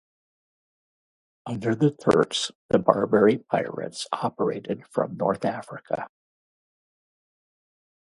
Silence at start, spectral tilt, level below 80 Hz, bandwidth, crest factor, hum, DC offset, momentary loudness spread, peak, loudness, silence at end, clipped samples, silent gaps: 1.45 s; -5.5 dB/octave; -64 dBFS; 11.5 kHz; 26 dB; none; under 0.1%; 12 LU; 0 dBFS; -25 LUFS; 2 s; under 0.1%; 2.55-2.69 s